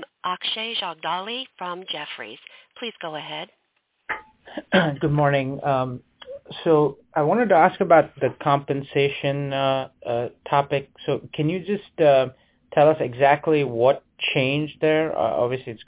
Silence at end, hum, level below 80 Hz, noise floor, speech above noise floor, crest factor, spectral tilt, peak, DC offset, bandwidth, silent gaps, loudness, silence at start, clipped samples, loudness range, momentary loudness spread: 0.05 s; none; -60 dBFS; -70 dBFS; 48 dB; 20 dB; -10 dB/octave; -2 dBFS; under 0.1%; 4 kHz; none; -22 LUFS; 0 s; under 0.1%; 9 LU; 15 LU